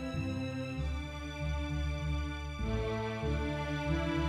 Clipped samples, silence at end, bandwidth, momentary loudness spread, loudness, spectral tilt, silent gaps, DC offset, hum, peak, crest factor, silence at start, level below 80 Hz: under 0.1%; 0 s; 11 kHz; 5 LU; -36 LUFS; -6.5 dB/octave; none; under 0.1%; none; -20 dBFS; 14 dB; 0 s; -40 dBFS